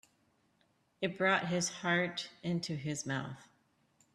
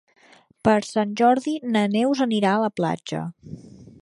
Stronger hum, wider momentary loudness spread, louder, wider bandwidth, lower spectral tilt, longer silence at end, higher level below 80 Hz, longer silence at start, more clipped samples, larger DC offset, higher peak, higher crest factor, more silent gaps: neither; second, 9 LU vs 15 LU; second, -34 LUFS vs -22 LUFS; about the same, 12.5 kHz vs 11.5 kHz; second, -4 dB/octave vs -6 dB/octave; first, 0.7 s vs 0.2 s; second, -74 dBFS vs -60 dBFS; first, 1 s vs 0.65 s; neither; neither; second, -16 dBFS vs -4 dBFS; about the same, 22 dB vs 20 dB; neither